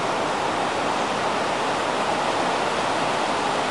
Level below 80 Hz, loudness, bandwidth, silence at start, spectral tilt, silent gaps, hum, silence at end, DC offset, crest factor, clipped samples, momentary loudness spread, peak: -58 dBFS; -23 LUFS; 11.5 kHz; 0 s; -3 dB/octave; none; none; 0 s; 0.3%; 12 dB; under 0.1%; 1 LU; -10 dBFS